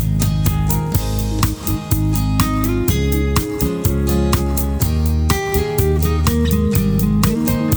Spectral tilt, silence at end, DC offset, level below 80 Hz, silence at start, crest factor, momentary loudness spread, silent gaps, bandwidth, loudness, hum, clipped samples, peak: -6 dB/octave; 0 s; under 0.1%; -22 dBFS; 0 s; 12 dB; 3 LU; none; over 20 kHz; -17 LUFS; none; under 0.1%; -4 dBFS